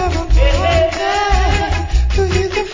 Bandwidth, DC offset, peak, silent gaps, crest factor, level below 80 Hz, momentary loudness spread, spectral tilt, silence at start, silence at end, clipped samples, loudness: 7.6 kHz; under 0.1%; -2 dBFS; none; 12 dB; -16 dBFS; 4 LU; -5.5 dB/octave; 0 s; 0 s; under 0.1%; -15 LUFS